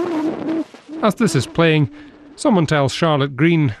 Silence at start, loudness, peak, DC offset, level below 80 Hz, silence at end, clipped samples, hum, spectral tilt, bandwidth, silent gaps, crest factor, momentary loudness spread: 0 s; -18 LUFS; -6 dBFS; under 0.1%; -50 dBFS; 0.05 s; under 0.1%; none; -6 dB/octave; 13.5 kHz; none; 12 dB; 8 LU